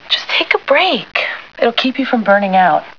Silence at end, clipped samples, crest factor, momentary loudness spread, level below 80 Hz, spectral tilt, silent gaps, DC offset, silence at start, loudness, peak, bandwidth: 0.05 s; under 0.1%; 14 dB; 6 LU; -62 dBFS; -5 dB/octave; none; 0.4%; 0.05 s; -13 LUFS; 0 dBFS; 5.4 kHz